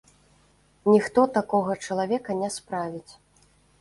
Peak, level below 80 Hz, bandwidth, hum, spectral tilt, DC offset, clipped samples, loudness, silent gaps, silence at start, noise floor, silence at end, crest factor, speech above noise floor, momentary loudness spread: -6 dBFS; -64 dBFS; 11.5 kHz; 50 Hz at -50 dBFS; -5.5 dB/octave; under 0.1%; under 0.1%; -25 LUFS; none; 0.85 s; -61 dBFS; 0.7 s; 20 dB; 37 dB; 11 LU